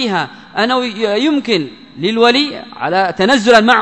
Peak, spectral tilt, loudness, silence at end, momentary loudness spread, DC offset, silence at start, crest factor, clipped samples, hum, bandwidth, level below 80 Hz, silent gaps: 0 dBFS; -4 dB/octave; -14 LUFS; 0 s; 12 LU; 0.2%; 0 s; 14 dB; 0.3%; none; 11 kHz; -54 dBFS; none